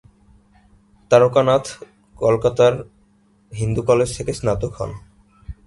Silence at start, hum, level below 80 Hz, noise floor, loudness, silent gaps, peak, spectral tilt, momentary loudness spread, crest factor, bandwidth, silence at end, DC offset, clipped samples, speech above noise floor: 1.1 s; none; -42 dBFS; -57 dBFS; -18 LUFS; none; 0 dBFS; -6 dB/octave; 20 LU; 20 dB; 11.5 kHz; 0.15 s; under 0.1%; under 0.1%; 39 dB